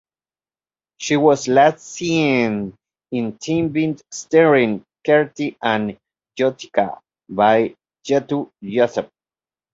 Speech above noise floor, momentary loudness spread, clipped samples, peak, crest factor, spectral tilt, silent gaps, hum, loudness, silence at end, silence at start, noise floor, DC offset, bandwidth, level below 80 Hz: over 72 dB; 14 LU; under 0.1%; -2 dBFS; 18 dB; -5.5 dB/octave; none; none; -19 LUFS; 0.7 s; 1 s; under -90 dBFS; under 0.1%; 7.8 kHz; -60 dBFS